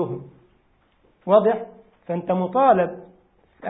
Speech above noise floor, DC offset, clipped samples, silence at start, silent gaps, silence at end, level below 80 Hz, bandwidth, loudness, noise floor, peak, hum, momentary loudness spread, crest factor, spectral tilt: 42 dB; under 0.1%; under 0.1%; 0 s; none; 0 s; -64 dBFS; 4 kHz; -21 LUFS; -62 dBFS; -4 dBFS; none; 19 LU; 20 dB; -11.5 dB/octave